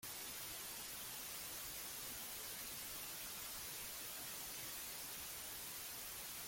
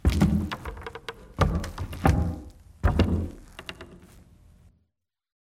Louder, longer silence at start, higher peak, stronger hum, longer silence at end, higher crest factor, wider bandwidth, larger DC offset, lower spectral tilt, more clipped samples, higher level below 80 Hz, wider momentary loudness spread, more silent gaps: second, -46 LUFS vs -27 LUFS; about the same, 0 s vs 0.05 s; second, -36 dBFS vs -6 dBFS; neither; second, 0 s vs 1.45 s; second, 14 dB vs 22 dB; about the same, 17 kHz vs 15.5 kHz; neither; second, -0.5 dB/octave vs -7 dB/octave; neither; second, -70 dBFS vs -34 dBFS; second, 1 LU vs 17 LU; neither